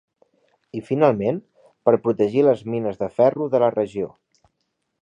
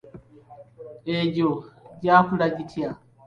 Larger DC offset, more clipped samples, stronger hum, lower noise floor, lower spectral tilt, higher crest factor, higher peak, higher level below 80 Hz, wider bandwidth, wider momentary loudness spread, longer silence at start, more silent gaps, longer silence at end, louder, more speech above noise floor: neither; neither; neither; first, -75 dBFS vs -48 dBFS; about the same, -9 dB/octave vs -8 dB/octave; about the same, 20 dB vs 22 dB; about the same, -2 dBFS vs -4 dBFS; about the same, -62 dBFS vs -58 dBFS; first, 9 kHz vs 7.2 kHz; second, 13 LU vs 18 LU; first, 0.75 s vs 0.15 s; neither; first, 0.95 s vs 0.35 s; about the same, -21 LUFS vs -23 LUFS; first, 55 dB vs 26 dB